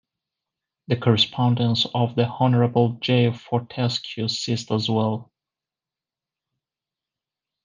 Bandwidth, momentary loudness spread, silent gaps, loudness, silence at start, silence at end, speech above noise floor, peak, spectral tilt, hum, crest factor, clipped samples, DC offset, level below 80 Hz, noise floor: 7.4 kHz; 7 LU; none; -22 LUFS; 0.9 s; 2.4 s; 68 dB; -4 dBFS; -6.5 dB/octave; none; 20 dB; under 0.1%; under 0.1%; -66 dBFS; -90 dBFS